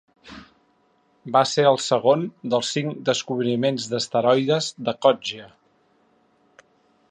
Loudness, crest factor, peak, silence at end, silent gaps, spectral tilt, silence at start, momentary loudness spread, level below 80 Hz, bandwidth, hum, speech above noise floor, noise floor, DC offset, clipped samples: -22 LUFS; 20 dB; -4 dBFS; 1.65 s; none; -4.5 dB/octave; 0.25 s; 10 LU; -68 dBFS; 10 kHz; none; 42 dB; -63 dBFS; under 0.1%; under 0.1%